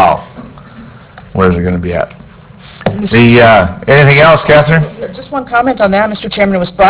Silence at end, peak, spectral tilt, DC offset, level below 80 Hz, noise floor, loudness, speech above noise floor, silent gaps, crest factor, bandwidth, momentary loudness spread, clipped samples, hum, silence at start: 0 s; 0 dBFS; -10 dB/octave; under 0.1%; -30 dBFS; -34 dBFS; -9 LUFS; 26 dB; none; 10 dB; 4 kHz; 14 LU; 1%; none; 0 s